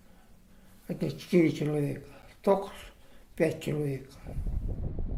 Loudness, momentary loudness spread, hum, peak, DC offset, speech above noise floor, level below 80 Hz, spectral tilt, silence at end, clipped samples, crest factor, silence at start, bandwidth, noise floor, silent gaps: -31 LUFS; 22 LU; none; -10 dBFS; under 0.1%; 26 dB; -42 dBFS; -7.5 dB/octave; 0 s; under 0.1%; 20 dB; 0.3 s; 16 kHz; -55 dBFS; none